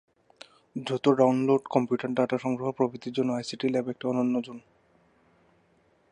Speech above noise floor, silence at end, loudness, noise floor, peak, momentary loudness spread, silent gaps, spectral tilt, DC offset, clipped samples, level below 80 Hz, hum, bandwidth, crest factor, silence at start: 39 dB; 1.55 s; -27 LUFS; -65 dBFS; -8 dBFS; 10 LU; none; -6.5 dB/octave; under 0.1%; under 0.1%; -74 dBFS; none; 9.8 kHz; 22 dB; 0.75 s